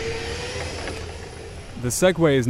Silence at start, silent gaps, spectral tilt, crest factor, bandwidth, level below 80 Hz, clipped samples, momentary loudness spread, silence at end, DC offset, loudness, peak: 0 s; none; -4.5 dB/octave; 18 dB; 16 kHz; -40 dBFS; under 0.1%; 18 LU; 0 s; under 0.1%; -24 LUFS; -6 dBFS